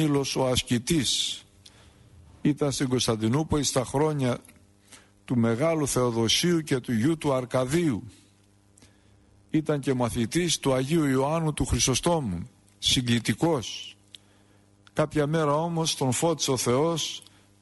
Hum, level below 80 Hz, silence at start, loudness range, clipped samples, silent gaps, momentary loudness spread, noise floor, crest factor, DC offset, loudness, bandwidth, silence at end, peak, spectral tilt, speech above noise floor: 50 Hz at -60 dBFS; -48 dBFS; 0 s; 3 LU; under 0.1%; none; 7 LU; -60 dBFS; 16 dB; under 0.1%; -25 LUFS; 12 kHz; 0.4 s; -12 dBFS; -4.5 dB/octave; 35 dB